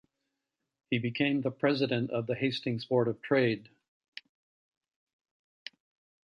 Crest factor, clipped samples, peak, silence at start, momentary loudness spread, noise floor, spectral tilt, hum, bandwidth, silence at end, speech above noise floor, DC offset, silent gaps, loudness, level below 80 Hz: 20 dB; under 0.1%; -14 dBFS; 0.9 s; 20 LU; -86 dBFS; -7.5 dB/octave; none; 6.8 kHz; 2.6 s; 56 dB; under 0.1%; none; -30 LUFS; -74 dBFS